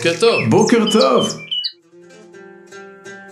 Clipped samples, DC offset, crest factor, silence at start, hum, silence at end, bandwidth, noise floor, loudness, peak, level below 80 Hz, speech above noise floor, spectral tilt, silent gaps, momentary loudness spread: under 0.1%; under 0.1%; 16 dB; 0 s; none; 0 s; 13 kHz; -44 dBFS; -15 LUFS; 0 dBFS; -60 dBFS; 30 dB; -4.5 dB/octave; none; 23 LU